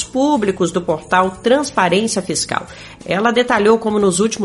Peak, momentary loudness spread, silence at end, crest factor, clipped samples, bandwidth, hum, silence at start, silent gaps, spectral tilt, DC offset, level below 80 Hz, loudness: 0 dBFS; 8 LU; 0 s; 16 dB; under 0.1%; 11.5 kHz; none; 0 s; none; -4 dB/octave; under 0.1%; -48 dBFS; -16 LUFS